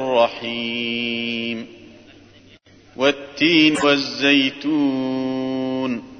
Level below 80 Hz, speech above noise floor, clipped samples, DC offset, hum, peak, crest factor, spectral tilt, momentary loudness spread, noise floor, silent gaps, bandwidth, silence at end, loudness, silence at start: -60 dBFS; 29 dB; under 0.1%; under 0.1%; none; -2 dBFS; 18 dB; -4.5 dB/octave; 10 LU; -49 dBFS; none; 9.4 kHz; 0 s; -19 LUFS; 0 s